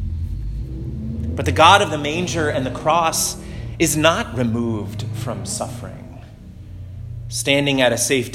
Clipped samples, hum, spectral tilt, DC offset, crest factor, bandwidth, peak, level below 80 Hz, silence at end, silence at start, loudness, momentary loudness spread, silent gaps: under 0.1%; none; -4 dB/octave; under 0.1%; 20 dB; 16.5 kHz; 0 dBFS; -34 dBFS; 0 s; 0 s; -19 LUFS; 20 LU; none